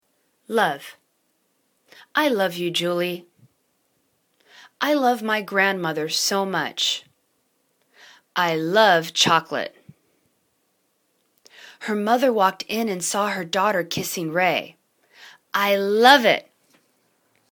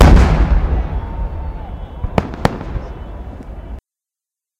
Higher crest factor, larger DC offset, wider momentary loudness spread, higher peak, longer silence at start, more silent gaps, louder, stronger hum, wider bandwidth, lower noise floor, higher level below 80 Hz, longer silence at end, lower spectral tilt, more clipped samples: first, 24 dB vs 16 dB; neither; second, 12 LU vs 19 LU; about the same, 0 dBFS vs 0 dBFS; first, 0.5 s vs 0 s; neither; second, -21 LUFS vs -18 LUFS; neither; first, 19 kHz vs 9.6 kHz; second, -69 dBFS vs -87 dBFS; second, -72 dBFS vs -18 dBFS; first, 1.1 s vs 0.8 s; second, -3 dB/octave vs -7 dB/octave; second, under 0.1% vs 0.3%